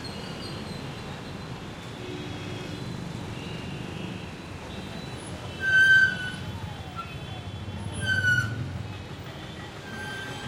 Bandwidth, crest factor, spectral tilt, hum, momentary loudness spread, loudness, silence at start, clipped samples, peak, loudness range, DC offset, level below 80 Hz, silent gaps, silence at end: 16.5 kHz; 20 dB; -4 dB/octave; none; 16 LU; -28 LUFS; 0 s; under 0.1%; -10 dBFS; 12 LU; under 0.1%; -52 dBFS; none; 0 s